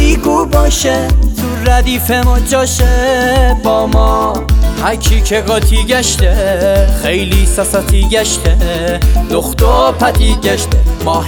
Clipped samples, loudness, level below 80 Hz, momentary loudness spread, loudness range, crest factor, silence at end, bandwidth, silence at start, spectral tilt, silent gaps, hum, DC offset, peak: under 0.1%; -11 LUFS; -12 dBFS; 3 LU; 0 LU; 10 dB; 0 s; 19.5 kHz; 0 s; -4.5 dB/octave; none; none; under 0.1%; 0 dBFS